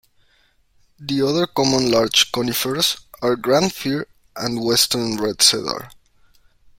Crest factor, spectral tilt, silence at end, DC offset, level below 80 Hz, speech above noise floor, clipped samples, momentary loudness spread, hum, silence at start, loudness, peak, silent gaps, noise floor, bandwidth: 20 dB; -3 dB/octave; 0.85 s; under 0.1%; -54 dBFS; 40 dB; under 0.1%; 12 LU; none; 1 s; -18 LUFS; -2 dBFS; none; -59 dBFS; 16.5 kHz